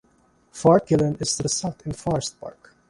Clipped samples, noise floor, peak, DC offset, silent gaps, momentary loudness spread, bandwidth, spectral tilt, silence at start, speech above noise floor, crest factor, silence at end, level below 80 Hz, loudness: under 0.1%; -61 dBFS; -4 dBFS; under 0.1%; none; 21 LU; 11.5 kHz; -5 dB/octave; 0.55 s; 39 dB; 20 dB; 0.4 s; -50 dBFS; -22 LUFS